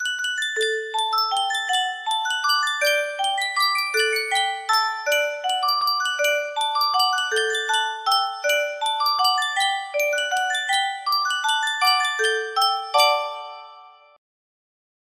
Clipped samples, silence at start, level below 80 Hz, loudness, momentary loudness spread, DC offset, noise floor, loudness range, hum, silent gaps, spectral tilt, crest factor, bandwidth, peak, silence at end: under 0.1%; 0 s; -76 dBFS; -21 LUFS; 5 LU; under 0.1%; -47 dBFS; 1 LU; none; none; 3.5 dB/octave; 18 dB; 16 kHz; -4 dBFS; 1.25 s